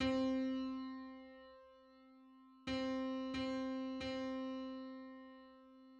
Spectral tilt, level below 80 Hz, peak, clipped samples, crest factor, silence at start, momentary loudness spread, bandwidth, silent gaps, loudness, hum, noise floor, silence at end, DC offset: -5.5 dB/octave; -68 dBFS; -26 dBFS; under 0.1%; 18 dB; 0 s; 24 LU; 8 kHz; none; -43 LUFS; none; -64 dBFS; 0 s; under 0.1%